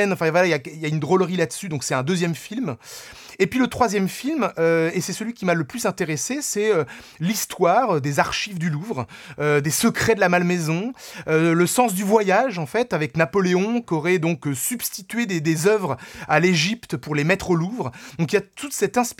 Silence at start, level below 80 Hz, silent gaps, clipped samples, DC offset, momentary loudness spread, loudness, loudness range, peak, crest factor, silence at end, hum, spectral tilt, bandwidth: 0 s; -56 dBFS; none; under 0.1%; under 0.1%; 10 LU; -21 LUFS; 3 LU; -2 dBFS; 20 dB; 0.05 s; none; -5 dB/octave; 18.5 kHz